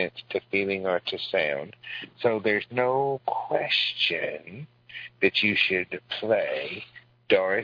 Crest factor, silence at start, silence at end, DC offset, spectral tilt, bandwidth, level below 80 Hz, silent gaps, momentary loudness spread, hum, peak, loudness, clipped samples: 22 dB; 0 s; 0 s; under 0.1%; -5.5 dB/octave; 5.4 kHz; -70 dBFS; none; 16 LU; none; -6 dBFS; -26 LUFS; under 0.1%